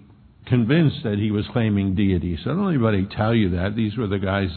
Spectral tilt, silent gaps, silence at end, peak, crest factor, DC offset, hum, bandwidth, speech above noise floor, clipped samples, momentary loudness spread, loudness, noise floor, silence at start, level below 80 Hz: -11.5 dB/octave; none; 0 s; -6 dBFS; 16 dB; under 0.1%; none; 4.5 kHz; 25 dB; under 0.1%; 5 LU; -21 LUFS; -46 dBFS; 0.45 s; -44 dBFS